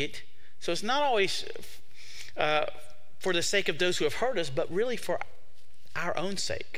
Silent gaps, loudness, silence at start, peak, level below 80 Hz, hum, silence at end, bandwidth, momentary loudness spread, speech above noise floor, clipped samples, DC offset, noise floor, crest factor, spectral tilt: none; -30 LUFS; 0 s; -10 dBFS; -62 dBFS; none; 0 s; 16 kHz; 18 LU; 32 dB; under 0.1%; 3%; -62 dBFS; 22 dB; -3 dB/octave